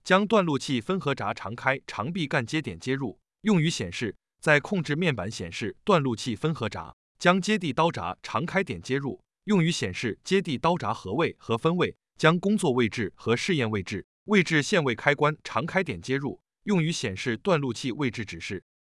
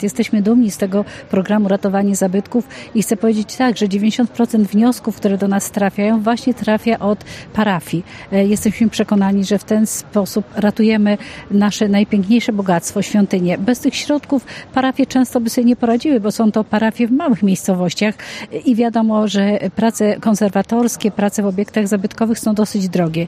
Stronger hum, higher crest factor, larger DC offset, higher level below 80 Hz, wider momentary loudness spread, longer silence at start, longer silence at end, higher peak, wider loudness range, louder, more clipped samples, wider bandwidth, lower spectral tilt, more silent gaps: neither; first, 22 dB vs 14 dB; neither; second, -62 dBFS vs -50 dBFS; first, 10 LU vs 5 LU; about the same, 0.05 s vs 0 s; first, 0.4 s vs 0 s; about the same, -4 dBFS vs -2 dBFS; about the same, 3 LU vs 1 LU; second, -27 LUFS vs -16 LUFS; neither; second, 12 kHz vs 15.5 kHz; about the same, -5.5 dB/octave vs -5.5 dB/octave; first, 6.93-7.15 s, 14.04-14.26 s vs none